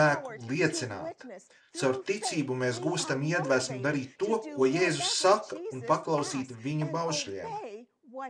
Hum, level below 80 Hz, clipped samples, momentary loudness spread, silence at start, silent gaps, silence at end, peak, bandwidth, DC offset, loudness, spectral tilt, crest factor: none; -74 dBFS; under 0.1%; 14 LU; 0 s; none; 0 s; -10 dBFS; 13 kHz; under 0.1%; -30 LUFS; -4 dB/octave; 20 dB